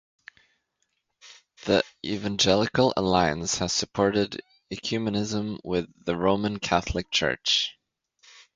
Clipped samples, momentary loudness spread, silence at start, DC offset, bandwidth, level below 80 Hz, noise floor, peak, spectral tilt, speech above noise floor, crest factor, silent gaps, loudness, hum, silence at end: under 0.1%; 9 LU; 1.25 s; under 0.1%; 9.6 kHz; -48 dBFS; -76 dBFS; -6 dBFS; -4 dB/octave; 51 dB; 22 dB; none; -25 LUFS; none; 0.85 s